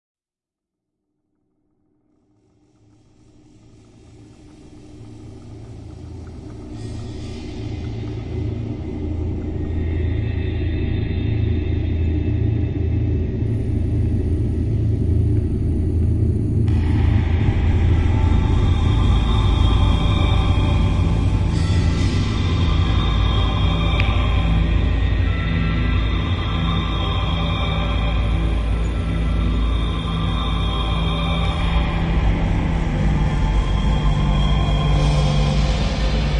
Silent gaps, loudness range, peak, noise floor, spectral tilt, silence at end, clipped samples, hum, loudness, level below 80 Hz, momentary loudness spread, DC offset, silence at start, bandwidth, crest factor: none; 11 LU; -2 dBFS; -89 dBFS; -7 dB/octave; 0 s; under 0.1%; none; -20 LUFS; -24 dBFS; 10 LU; under 0.1%; 4.2 s; 9.6 kHz; 16 dB